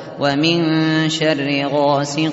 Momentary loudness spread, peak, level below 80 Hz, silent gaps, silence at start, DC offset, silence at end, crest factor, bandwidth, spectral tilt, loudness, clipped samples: 3 LU; -2 dBFS; -58 dBFS; none; 0 s; under 0.1%; 0 s; 14 dB; 8 kHz; -4 dB/octave; -17 LUFS; under 0.1%